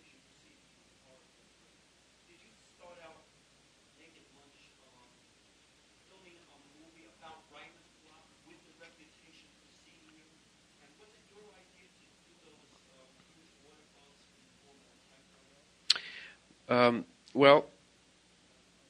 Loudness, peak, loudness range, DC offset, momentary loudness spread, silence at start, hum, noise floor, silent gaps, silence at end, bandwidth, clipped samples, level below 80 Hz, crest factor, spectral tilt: -28 LUFS; -4 dBFS; 28 LU; under 0.1%; 34 LU; 15.9 s; none; -66 dBFS; none; 1.25 s; 10.5 kHz; under 0.1%; -78 dBFS; 34 dB; -4 dB/octave